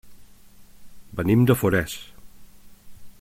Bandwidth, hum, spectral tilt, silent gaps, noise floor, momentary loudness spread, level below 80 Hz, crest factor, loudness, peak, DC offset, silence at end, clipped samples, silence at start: 16.5 kHz; none; -6.5 dB/octave; none; -47 dBFS; 18 LU; -50 dBFS; 22 dB; -21 LUFS; -4 dBFS; under 0.1%; 0.1 s; under 0.1%; 0.05 s